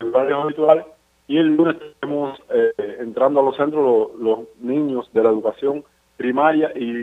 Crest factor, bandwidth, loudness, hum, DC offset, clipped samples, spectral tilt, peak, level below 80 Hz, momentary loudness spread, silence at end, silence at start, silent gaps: 18 dB; 4.1 kHz; -19 LUFS; none; under 0.1%; under 0.1%; -8 dB/octave; 0 dBFS; -66 dBFS; 9 LU; 0 s; 0 s; none